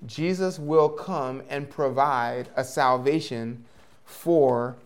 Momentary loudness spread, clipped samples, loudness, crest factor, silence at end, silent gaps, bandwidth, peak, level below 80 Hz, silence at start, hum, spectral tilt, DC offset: 12 LU; under 0.1%; -25 LUFS; 18 dB; 0.1 s; none; 17 kHz; -8 dBFS; -68 dBFS; 0 s; none; -6 dB/octave; 0.2%